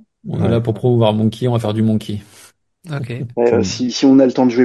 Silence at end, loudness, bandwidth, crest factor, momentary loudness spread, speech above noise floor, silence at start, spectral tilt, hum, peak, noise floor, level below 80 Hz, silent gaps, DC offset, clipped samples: 0 s; -16 LUFS; 12.5 kHz; 16 dB; 15 LU; 32 dB; 0.25 s; -7 dB/octave; none; 0 dBFS; -47 dBFS; -44 dBFS; none; under 0.1%; under 0.1%